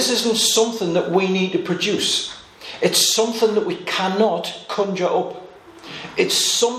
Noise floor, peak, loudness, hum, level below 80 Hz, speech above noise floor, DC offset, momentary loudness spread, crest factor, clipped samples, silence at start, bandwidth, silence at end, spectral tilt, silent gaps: -39 dBFS; -2 dBFS; -19 LUFS; none; -64 dBFS; 20 dB; under 0.1%; 14 LU; 18 dB; under 0.1%; 0 s; 15.5 kHz; 0 s; -2.5 dB/octave; none